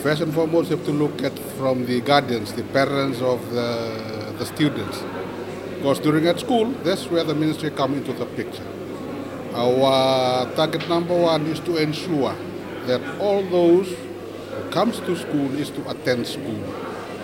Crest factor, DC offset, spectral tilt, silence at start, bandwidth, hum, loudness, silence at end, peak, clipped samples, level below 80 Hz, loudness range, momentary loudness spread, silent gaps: 20 dB; under 0.1%; -6 dB/octave; 0 s; 17 kHz; none; -22 LUFS; 0 s; -2 dBFS; under 0.1%; -58 dBFS; 4 LU; 12 LU; none